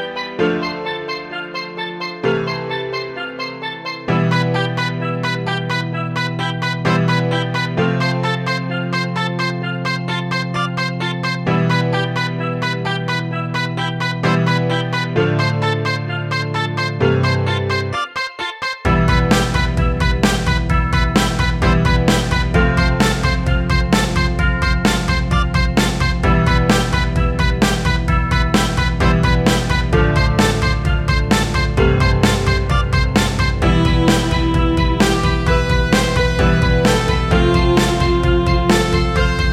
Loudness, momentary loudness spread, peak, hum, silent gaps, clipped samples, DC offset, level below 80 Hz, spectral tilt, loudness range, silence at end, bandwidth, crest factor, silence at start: -17 LUFS; 7 LU; 0 dBFS; none; none; under 0.1%; under 0.1%; -22 dBFS; -5.5 dB/octave; 5 LU; 0 s; 14 kHz; 16 dB; 0 s